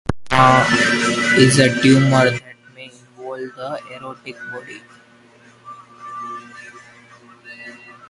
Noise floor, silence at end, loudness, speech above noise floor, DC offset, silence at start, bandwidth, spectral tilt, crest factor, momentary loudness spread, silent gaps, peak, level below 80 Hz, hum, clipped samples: -49 dBFS; 0.35 s; -14 LUFS; 33 dB; under 0.1%; 0.1 s; 11.5 kHz; -5 dB/octave; 18 dB; 25 LU; none; 0 dBFS; -46 dBFS; none; under 0.1%